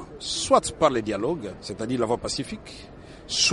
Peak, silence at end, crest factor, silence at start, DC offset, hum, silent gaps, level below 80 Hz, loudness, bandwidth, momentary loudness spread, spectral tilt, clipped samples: -4 dBFS; 0 s; 22 dB; 0 s; under 0.1%; none; none; -50 dBFS; -25 LUFS; 11.5 kHz; 20 LU; -3 dB/octave; under 0.1%